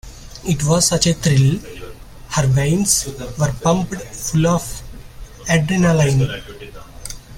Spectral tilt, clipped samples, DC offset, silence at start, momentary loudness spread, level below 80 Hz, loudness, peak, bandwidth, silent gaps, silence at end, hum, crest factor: -4.5 dB/octave; under 0.1%; under 0.1%; 0.05 s; 20 LU; -36 dBFS; -17 LUFS; 0 dBFS; 16.5 kHz; none; 0 s; none; 18 dB